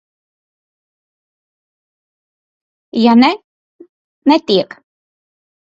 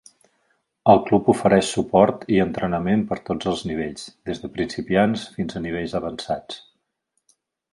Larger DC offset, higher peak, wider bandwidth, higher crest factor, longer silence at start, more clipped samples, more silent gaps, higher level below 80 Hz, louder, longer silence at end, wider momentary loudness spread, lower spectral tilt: neither; about the same, 0 dBFS vs 0 dBFS; second, 7.6 kHz vs 11.5 kHz; about the same, 18 dB vs 22 dB; first, 2.95 s vs 0.85 s; neither; first, 3.44-3.79 s, 3.89-4.22 s vs none; second, -62 dBFS vs -50 dBFS; first, -13 LUFS vs -21 LUFS; about the same, 1.15 s vs 1.15 s; about the same, 15 LU vs 13 LU; about the same, -6 dB/octave vs -6 dB/octave